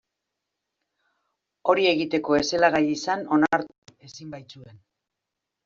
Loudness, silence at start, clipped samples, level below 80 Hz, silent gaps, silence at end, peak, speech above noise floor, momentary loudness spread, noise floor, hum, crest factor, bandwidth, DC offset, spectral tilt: -22 LUFS; 1.65 s; under 0.1%; -62 dBFS; 3.78-3.82 s; 0.9 s; -6 dBFS; 61 dB; 20 LU; -84 dBFS; none; 20 dB; 7.6 kHz; under 0.1%; -4.5 dB/octave